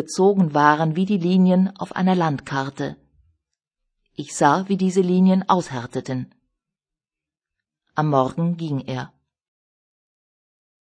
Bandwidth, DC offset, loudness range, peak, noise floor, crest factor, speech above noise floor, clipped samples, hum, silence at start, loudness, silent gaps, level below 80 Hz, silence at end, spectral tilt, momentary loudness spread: 10 kHz; under 0.1%; 6 LU; -2 dBFS; -90 dBFS; 20 dB; 70 dB; under 0.1%; none; 0 s; -20 LUFS; none; -64 dBFS; 1.75 s; -6.5 dB/octave; 14 LU